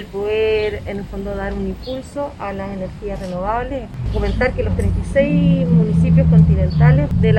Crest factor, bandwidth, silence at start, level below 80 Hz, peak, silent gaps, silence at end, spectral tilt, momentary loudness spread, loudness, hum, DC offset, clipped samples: 16 dB; 9.4 kHz; 0 s; -26 dBFS; 0 dBFS; none; 0 s; -9 dB/octave; 14 LU; -18 LUFS; none; under 0.1%; under 0.1%